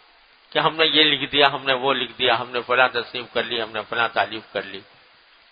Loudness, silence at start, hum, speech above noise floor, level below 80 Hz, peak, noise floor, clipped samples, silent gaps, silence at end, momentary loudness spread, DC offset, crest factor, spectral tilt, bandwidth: -20 LUFS; 0.55 s; none; 33 dB; -62 dBFS; 0 dBFS; -54 dBFS; under 0.1%; none; 0.7 s; 12 LU; under 0.1%; 22 dB; -6.5 dB/octave; 5.2 kHz